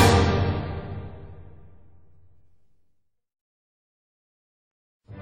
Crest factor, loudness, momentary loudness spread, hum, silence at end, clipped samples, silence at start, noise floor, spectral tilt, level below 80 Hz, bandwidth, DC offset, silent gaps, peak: 24 dB; -25 LUFS; 27 LU; none; 0 s; under 0.1%; 0 s; -69 dBFS; -5.5 dB/octave; -40 dBFS; 15.5 kHz; 0.4%; 3.41-5.00 s; -4 dBFS